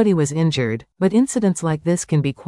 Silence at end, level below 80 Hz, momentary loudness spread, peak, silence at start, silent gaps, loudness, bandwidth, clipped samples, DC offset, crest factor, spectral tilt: 0.05 s; -54 dBFS; 4 LU; -6 dBFS; 0 s; none; -19 LUFS; 12 kHz; under 0.1%; under 0.1%; 12 dB; -6 dB/octave